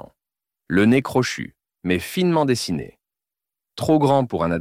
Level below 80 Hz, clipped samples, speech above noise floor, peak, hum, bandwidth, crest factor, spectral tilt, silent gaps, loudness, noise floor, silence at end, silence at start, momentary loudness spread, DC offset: -52 dBFS; under 0.1%; 69 dB; -6 dBFS; none; 16.5 kHz; 16 dB; -6 dB/octave; none; -20 LUFS; -88 dBFS; 0 s; 0.7 s; 15 LU; under 0.1%